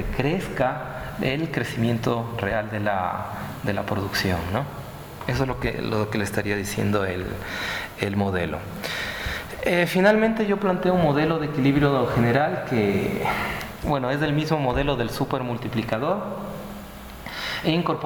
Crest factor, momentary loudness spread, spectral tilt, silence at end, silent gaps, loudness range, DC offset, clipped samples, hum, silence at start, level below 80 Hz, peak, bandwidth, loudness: 16 dB; 10 LU; -6 dB/octave; 0 s; none; 6 LU; under 0.1%; under 0.1%; none; 0 s; -42 dBFS; -8 dBFS; over 20 kHz; -24 LUFS